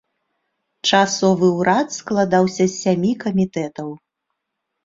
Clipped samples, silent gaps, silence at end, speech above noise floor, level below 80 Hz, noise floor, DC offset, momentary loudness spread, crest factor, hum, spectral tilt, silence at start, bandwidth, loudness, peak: under 0.1%; none; 0.9 s; 60 dB; -58 dBFS; -78 dBFS; under 0.1%; 9 LU; 18 dB; none; -5 dB/octave; 0.85 s; 7.8 kHz; -18 LUFS; -2 dBFS